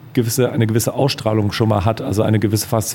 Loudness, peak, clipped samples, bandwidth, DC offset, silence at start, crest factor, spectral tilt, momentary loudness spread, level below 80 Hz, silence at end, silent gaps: -17 LUFS; 0 dBFS; under 0.1%; 17 kHz; under 0.1%; 0.05 s; 16 dB; -5.5 dB/octave; 2 LU; -46 dBFS; 0 s; none